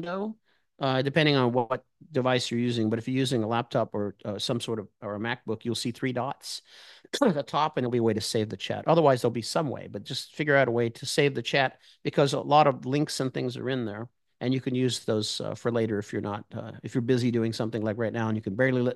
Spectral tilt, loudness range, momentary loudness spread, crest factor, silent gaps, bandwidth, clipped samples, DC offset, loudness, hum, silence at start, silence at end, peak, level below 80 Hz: -5.5 dB/octave; 5 LU; 12 LU; 20 dB; none; 12.5 kHz; under 0.1%; under 0.1%; -27 LUFS; none; 0 s; 0 s; -6 dBFS; -70 dBFS